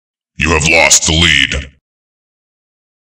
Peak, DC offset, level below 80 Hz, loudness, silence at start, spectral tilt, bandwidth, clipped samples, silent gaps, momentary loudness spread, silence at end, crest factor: 0 dBFS; under 0.1%; -28 dBFS; -8 LUFS; 0.4 s; -2 dB/octave; over 20 kHz; 0.3%; none; 10 LU; 1.4 s; 14 dB